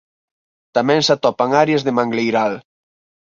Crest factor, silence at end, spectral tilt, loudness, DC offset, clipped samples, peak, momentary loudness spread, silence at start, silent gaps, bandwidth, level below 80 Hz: 16 dB; 0.65 s; -5 dB/octave; -17 LUFS; under 0.1%; under 0.1%; -2 dBFS; 8 LU; 0.75 s; none; 7.6 kHz; -62 dBFS